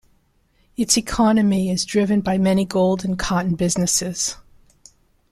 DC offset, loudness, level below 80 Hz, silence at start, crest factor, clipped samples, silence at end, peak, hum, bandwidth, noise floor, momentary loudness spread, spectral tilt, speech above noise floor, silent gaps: under 0.1%; -19 LUFS; -42 dBFS; 0.8 s; 18 dB; under 0.1%; 0.95 s; -2 dBFS; none; 14 kHz; -61 dBFS; 8 LU; -4.5 dB/octave; 42 dB; none